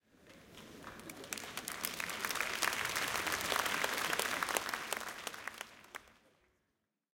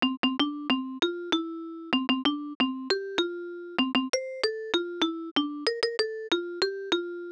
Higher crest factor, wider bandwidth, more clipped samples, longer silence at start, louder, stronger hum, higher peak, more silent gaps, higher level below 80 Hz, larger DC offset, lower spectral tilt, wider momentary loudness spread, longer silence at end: first, 32 dB vs 20 dB; first, 17 kHz vs 10.5 kHz; neither; first, 0.2 s vs 0 s; second, -37 LUFS vs -29 LUFS; neither; about the same, -10 dBFS vs -10 dBFS; second, none vs 0.17-0.23 s, 2.55-2.60 s, 5.31-5.36 s; about the same, -70 dBFS vs -68 dBFS; neither; second, -0.5 dB/octave vs -2.5 dB/octave; first, 18 LU vs 4 LU; first, 1.05 s vs 0 s